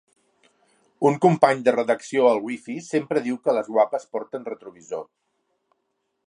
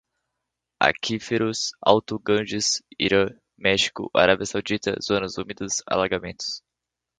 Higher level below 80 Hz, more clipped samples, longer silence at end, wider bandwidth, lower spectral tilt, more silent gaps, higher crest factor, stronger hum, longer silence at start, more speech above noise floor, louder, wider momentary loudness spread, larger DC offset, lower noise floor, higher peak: second, -76 dBFS vs -54 dBFS; neither; first, 1.25 s vs 0.6 s; first, 11 kHz vs 9.6 kHz; first, -6.5 dB/octave vs -3 dB/octave; neither; about the same, 22 dB vs 24 dB; neither; first, 1 s vs 0.8 s; second, 53 dB vs 61 dB; about the same, -22 LUFS vs -23 LUFS; first, 16 LU vs 8 LU; neither; second, -75 dBFS vs -85 dBFS; about the same, -2 dBFS vs 0 dBFS